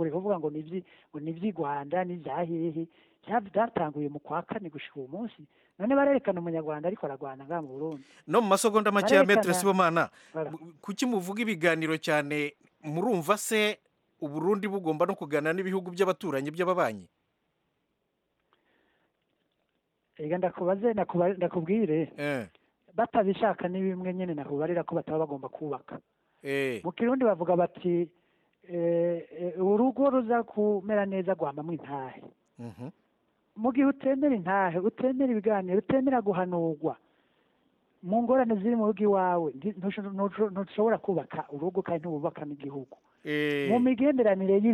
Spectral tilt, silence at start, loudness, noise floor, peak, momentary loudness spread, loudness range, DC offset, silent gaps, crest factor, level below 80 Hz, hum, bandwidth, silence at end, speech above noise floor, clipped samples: -6 dB/octave; 0 s; -29 LUFS; -78 dBFS; -8 dBFS; 14 LU; 7 LU; under 0.1%; none; 20 dB; -72 dBFS; none; 15.5 kHz; 0 s; 50 dB; under 0.1%